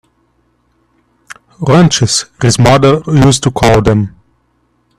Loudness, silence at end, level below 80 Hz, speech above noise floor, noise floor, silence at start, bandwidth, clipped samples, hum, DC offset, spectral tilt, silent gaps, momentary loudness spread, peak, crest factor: -9 LUFS; 0.9 s; -32 dBFS; 49 dB; -57 dBFS; 1.6 s; 14.5 kHz; under 0.1%; 60 Hz at -30 dBFS; under 0.1%; -5 dB/octave; none; 6 LU; 0 dBFS; 12 dB